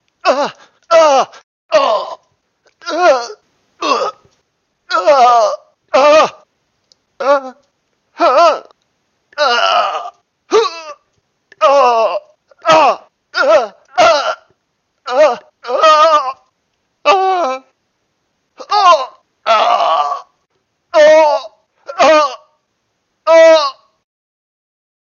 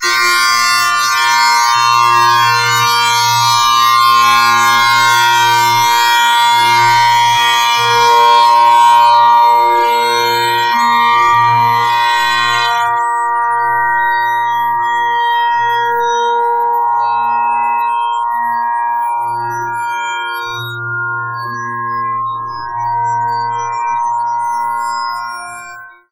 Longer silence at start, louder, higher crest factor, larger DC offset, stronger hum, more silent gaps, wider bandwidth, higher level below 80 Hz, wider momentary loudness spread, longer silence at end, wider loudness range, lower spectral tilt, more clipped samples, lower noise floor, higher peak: first, 0.25 s vs 0 s; about the same, -12 LUFS vs -11 LUFS; about the same, 14 dB vs 12 dB; second, under 0.1% vs 0.4%; neither; first, 1.43-1.69 s vs none; second, 7.2 kHz vs 16 kHz; second, -66 dBFS vs -56 dBFS; first, 16 LU vs 10 LU; first, 1.3 s vs 0.2 s; second, 3 LU vs 9 LU; about the same, -2 dB/octave vs -1 dB/octave; neither; first, -67 dBFS vs -32 dBFS; about the same, 0 dBFS vs 0 dBFS